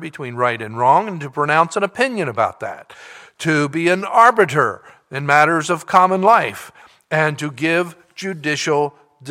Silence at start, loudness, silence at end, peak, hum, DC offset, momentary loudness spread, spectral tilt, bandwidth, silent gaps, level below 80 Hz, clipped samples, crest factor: 0 s; -17 LUFS; 0 s; 0 dBFS; none; under 0.1%; 15 LU; -5 dB/octave; 16 kHz; none; -66 dBFS; under 0.1%; 18 dB